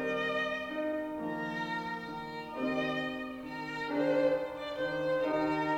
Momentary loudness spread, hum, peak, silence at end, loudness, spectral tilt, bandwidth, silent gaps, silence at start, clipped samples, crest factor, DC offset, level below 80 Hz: 10 LU; none; -18 dBFS; 0 s; -34 LUFS; -6 dB/octave; 16.5 kHz; none; 0 s; under 0.1%; 16 dB; under 0.1%; -64 dBFS